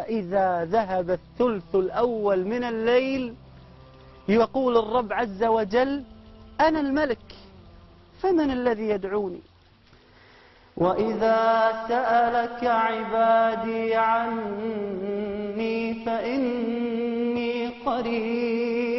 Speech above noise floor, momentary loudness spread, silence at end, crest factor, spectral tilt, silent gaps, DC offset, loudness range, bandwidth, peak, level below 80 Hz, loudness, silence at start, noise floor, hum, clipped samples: 32 dB; 8 LU; 0 s; 16 dB; -7.5 dB/octave; none; under 0.1%; 5 LU; 6 kHz; -10 dBFS; -54 dBFS; -24 LUFS; 0 s; -55 dBFS; none; under 0.1%